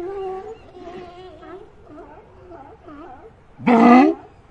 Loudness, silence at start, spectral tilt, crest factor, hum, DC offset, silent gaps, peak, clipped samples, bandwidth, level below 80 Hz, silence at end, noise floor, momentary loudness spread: -15 LUFS; 0 s; -7 dB/octave; 20 dB; none; under 0.1%; none; 0 dBFS; under 0.1%; 7.4 kHz; -54 dBFS; 0.3 s; -43 dBFS; 29 LU